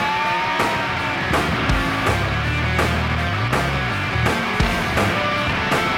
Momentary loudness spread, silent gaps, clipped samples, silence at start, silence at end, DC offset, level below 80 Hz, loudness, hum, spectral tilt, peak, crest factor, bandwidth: 2 LU; none; under 0.1%; 0 s; 0 s; under 0.1%; -30 dBFS; -20 LUFS; none; -5 dB/octave; -4 dBFS; 16 dB; 16.5 kHz